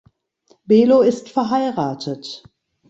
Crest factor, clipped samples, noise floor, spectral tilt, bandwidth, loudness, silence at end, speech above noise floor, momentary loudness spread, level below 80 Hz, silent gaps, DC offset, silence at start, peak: 16 dB; under 0.1%; -59 dBFS; -6.5 dB/octave; 8 kHz; -17 LUFS; 0.55 s; 42 dB; 18 LU; -62 dBFS; none; under 0.1%; 0.7 s; -4 dBFS